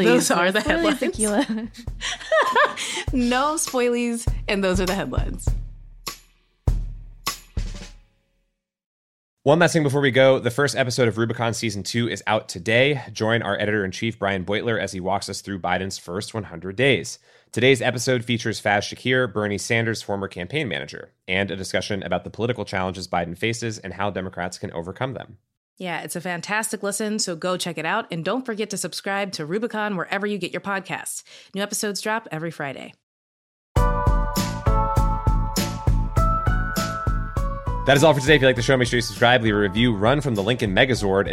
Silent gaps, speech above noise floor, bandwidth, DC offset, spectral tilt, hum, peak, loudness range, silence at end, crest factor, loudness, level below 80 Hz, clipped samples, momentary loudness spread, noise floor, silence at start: 8.86-9.37 s, 25.57-25.77 s, 33.03-33.75 s; 51 dB; 16 kHz; under 0.1%; -4.5 dB/octave; none; -2 dBFS; 9 LU; 0 s; 20 dB; -22 LUFS; -32 dBFS; under 0.1%; 12 LU; -73 dBFS; 0 s